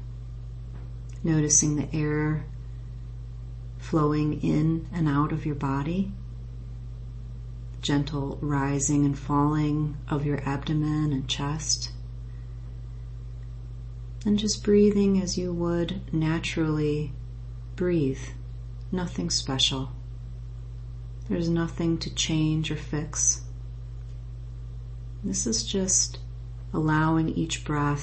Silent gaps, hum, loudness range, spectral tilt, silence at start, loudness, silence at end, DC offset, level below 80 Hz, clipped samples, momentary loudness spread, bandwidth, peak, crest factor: none; none; 4 LU; -4.5 dB/octave; 0 s; -26 LUFS; 0 s; under 0.1%; -40 dBFS; under 0.1%; 17 LU; 8.8 kHz; -8 dBFS; 20 dB